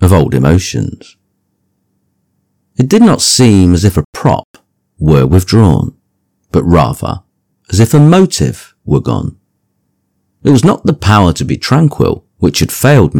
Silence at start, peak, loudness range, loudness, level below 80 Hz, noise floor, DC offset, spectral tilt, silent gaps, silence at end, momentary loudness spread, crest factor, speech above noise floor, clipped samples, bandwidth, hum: 0 s; 0 dBFS; 3 LU; -10 LUFS; -30 dBFS; -63 dBFS; under 0.1%; -6 dB/octave; 4.04-4.13 s, 4.44-4.54 s; 0 s; 11 LU; 10 dB; 54 dB; 3%; 18 kHz; none